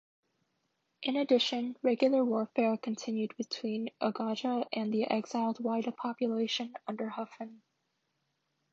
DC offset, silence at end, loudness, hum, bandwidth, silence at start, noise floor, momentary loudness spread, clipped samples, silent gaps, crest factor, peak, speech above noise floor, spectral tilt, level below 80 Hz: under 0.1%; 1.15 s; -33 LUFS; none; 7.6 kHz; 1 s; -80 dBFS; 11 LU; under 0.1%; none; 20 dB; -14 dBFS; 48 dB; -5 dB/octave; -86 dBFS